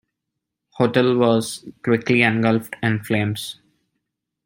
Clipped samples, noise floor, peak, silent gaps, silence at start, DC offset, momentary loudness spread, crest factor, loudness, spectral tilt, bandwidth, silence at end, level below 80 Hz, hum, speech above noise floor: under 0.1%; -81 dBFS; -2 dBFS; none; 0.75 s; under 0.1%; 12 LU; 20 dB; -20 LUFS; -6 dB/octave; 16.5 kHz; 0.9 s; -60 dBFS; none; 62 dB